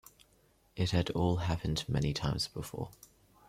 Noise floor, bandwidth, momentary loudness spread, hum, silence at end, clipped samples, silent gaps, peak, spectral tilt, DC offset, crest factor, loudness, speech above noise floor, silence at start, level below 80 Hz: -68 dBFS; 15.5 kHz; 11 LU; none; 0.55 s; under 0.1%; none; -16 dBFS; -5.5 dB/octave; under 0.1%; 20 dB; -34 LUFS; 35 dB; 0.75 s; -50 dBFS